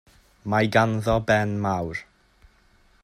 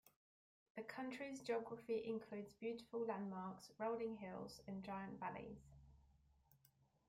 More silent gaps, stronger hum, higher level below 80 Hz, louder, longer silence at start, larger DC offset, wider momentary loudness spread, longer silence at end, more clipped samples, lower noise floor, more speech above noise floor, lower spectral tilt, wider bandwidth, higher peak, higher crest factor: neither; neither; first, -48 dBFS vs -78 dBFS; first, -23 LUFS vs -49 LUFS; second, 0.45 s vs 0.75 s; neither; first, 13 LU vs 10 LU; first, 1 s vs 0.55 s; neither; second, -59 dBFS vs -78 dBFS; first, 36 dB vs 29 dB; about the same, -6.5 dB/octave vs -6 dB/octave; second, 14.5 kHz vs 16 kHz; first, -4 dBFS vs -32 dBFS; about the same, 20 dB vs 18 dB